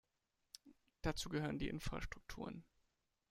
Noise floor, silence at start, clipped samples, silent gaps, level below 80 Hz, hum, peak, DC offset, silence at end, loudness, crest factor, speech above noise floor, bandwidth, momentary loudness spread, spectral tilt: -87 dBFS; 0.65 s; under 0.1%; none; -56 dBFS; none; -24 dBFS; under 0.1%; 0.7 s; -46 LUFS; 22 dB; 43 dB; 16 kHz; 18 LU; -5 dB/octave